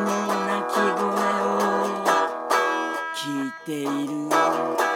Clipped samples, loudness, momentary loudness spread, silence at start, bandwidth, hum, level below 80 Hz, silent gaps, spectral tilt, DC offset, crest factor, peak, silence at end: under 0.1%; -23 LUFS; 6 LU; 0 s; 18 kHz; none; -78 dBFS; none; -4 dB/octave; under 0.1%; 16 dB; -8 dBFS; 0 s